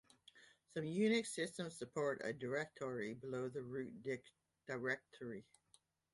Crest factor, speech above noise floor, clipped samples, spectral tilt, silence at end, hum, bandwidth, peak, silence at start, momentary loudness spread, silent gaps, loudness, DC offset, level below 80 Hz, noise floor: 18 dB; 32 dB; under 0.1%; -5 dB/octave; 0.7 s; none; 11.5 kHz; -26 dBFS; 0.35 s; 14 LU; none; -43 LUFS; under 0.1%; -82 dBFS; -75 dBFS